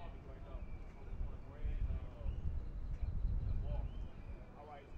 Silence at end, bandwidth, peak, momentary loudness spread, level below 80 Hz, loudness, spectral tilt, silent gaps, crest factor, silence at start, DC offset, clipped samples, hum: 0 s; 4.8 kHz; -26 dBFS; 11 LU; -42 dBFS; -46 LUFS; -9 dB/octave; none; 16 dB; 0 s; under 0.1%; under 0.1%; none